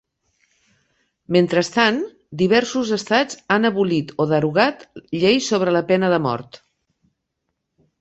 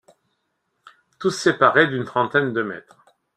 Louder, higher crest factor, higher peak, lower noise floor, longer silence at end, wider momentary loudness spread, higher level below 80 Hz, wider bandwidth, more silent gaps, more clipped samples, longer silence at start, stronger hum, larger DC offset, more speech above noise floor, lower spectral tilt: about the same, -19 LUFS vs -20 LUFS; about the same, 18 dB vs 22 dB; about the same, -2 dBFS vs 0 dBFS; first, -77 dBFS vs -73 dBFS; first, 1.45 s vs 0.55 s; second, 7 LU vs 12 LU; first, -60 dBFS vs -66 dBFS; second, 8.2 kHz vs 13 kHz; neither; neither; about the same, 1.3 s vs 1.2 s; neither; neither; first, 58 dB vs 53 dB; about the same, -5 dB/octave vs -5 dB/octave